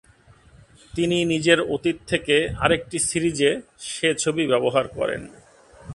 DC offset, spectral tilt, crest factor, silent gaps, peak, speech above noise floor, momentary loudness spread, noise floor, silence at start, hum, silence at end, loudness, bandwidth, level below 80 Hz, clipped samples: under 0.1%; -3.5 dB/octave; 22 dB; none; 0 dBFS; 31 dB; 8 LU; -53 dBFS; 0.95 s; none; 0 s; -22 LUFS; 11.5 kHz; -48 dBFS; under 0.1%